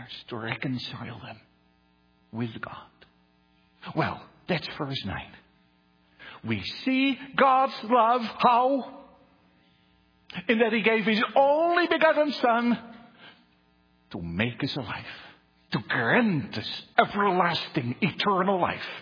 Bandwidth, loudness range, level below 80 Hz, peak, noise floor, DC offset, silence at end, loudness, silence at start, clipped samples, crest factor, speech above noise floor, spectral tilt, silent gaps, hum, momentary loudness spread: 5.4 kHz; 11 LU; -64 dBFS; -2 dBFS; -64 dBFS; under 0.1%; 0 s; -25 LUFS; 0 s; under 0.1%; 26 dB; 39 dB; -7 dB/octave; none; none; 19 LU